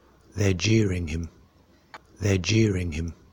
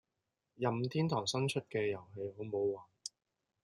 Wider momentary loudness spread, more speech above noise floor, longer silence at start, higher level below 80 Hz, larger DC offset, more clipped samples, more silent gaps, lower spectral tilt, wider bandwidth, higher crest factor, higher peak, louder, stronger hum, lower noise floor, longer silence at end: about the same, 12 LU vs 12 LU; second, 34 dB vs 51 dB; second, 0.35 s vs 0.6 s; first, -42 dBFS vs -78 dBFS; neither; neither; neither; about the same, -5.5 dB/octave vs -5.5 dB/octave; first, 17 kHz vs 12 kHz; about the same, 16 dB vs 18 dB; first, -10 dBFS vs -20 dBFS; first, -25 LUFS vs -37 LUFS; neither; second, -58 dBFS vs -88 dBFS; second, 0.2 s vs 0.55 s